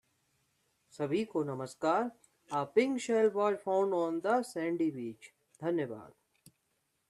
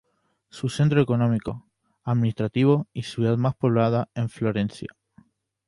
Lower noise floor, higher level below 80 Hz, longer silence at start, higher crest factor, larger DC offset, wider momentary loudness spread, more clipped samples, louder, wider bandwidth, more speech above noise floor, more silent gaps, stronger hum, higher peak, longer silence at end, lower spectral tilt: first, -79 dBFS vs -67 dBFS; second, -80 dBFS vs -56 dBFS; first, 0.95 s vs 0.55 s; about the same, 20 dB vs 18 dB; neither; about the same, 11 LU vs 13 LU; neither; second, -33 LUFS vs -24 LUFS; about the same, 12.5 kHz vs 11.5 kHz; about the same, 47 dB vs 44 dB; neither; neither; second, -14 dBFS vs -6 dBFS; first, 1 s vs 0.8 s; second, -6 dB/octave vs -8 dB/octave